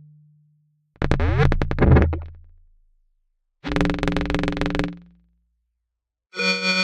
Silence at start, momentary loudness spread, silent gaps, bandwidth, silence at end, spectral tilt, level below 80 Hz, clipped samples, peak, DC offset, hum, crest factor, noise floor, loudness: 1 s; 15 LU; none; 10 kHz; 0 s; -6 dB/octave; -30 dBFS; under 0.1%; 0 dBFS; under 0.1%; none; 22 dB; -82 dBFS; -22 LUFS